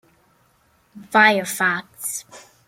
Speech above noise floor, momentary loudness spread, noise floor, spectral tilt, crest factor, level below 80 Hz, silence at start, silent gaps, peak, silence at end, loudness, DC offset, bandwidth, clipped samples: 40 dB; 13 LU; -61 dBFS; -2.5 dB/octave; 22 dB; -68 dBFS; 0.95 s; none; -2 dBFS; 0.3 s; -19 LUFS; under 0.1%; 16.5 kHz; under 0.1%